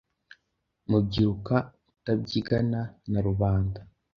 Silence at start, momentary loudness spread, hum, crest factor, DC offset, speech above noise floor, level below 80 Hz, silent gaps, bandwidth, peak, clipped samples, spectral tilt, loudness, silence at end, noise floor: 0.9 s; 13 LU; none; 20 dB; under 0.1%; 52 dB; -44 dBFS; none; 6.6 kHz; -8 dBFS; under 0.1%; -8.5 dB/octave; -27 LUFS; 0.3 s; -78 dBFS